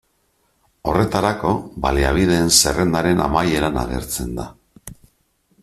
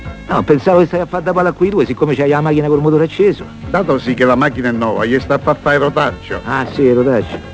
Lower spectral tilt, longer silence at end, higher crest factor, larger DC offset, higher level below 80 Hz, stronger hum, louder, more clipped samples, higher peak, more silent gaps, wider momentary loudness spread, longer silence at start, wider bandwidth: second, -4 dB/octave vs -7.5 dB/octave; first, 0.7 s vs 0 s; first, 20 dB vs 14 dB; neither; first, -32 dBFS vs -38 dBFS; neither; second, -18 LUFS vs -14 LUFS; neither; about the same, 0 dBFS vs 0 dBFS; neither; first, 12 LU vs 6 LU; first, 0.85 s vs 0 s; first, 15 kHz vs 8 kHz